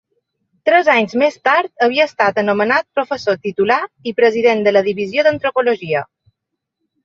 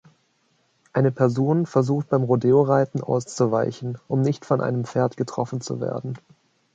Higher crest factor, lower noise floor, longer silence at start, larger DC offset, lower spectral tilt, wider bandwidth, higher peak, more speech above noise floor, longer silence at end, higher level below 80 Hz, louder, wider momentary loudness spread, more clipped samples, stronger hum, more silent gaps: about the same, 16 dB vs 18 dB; first, -78 dBFS vs -66 dBFS; second, 0.65 s vs 0.95 s; neither; second, -5 dB/octave vs -7.5 dB/octave; second, 7.4 kHz vs 9 kHz; first, 0 dBFS vs -4 dBFS; first, 63 dB vs 45 dB; first, 1 s vs 0.6 s; about the same, -62 dBFS vs -64 dBFS; first, -15 LUFS vs -23 LUFS; second, 7 LU vs 10 LU; neither; neither; neither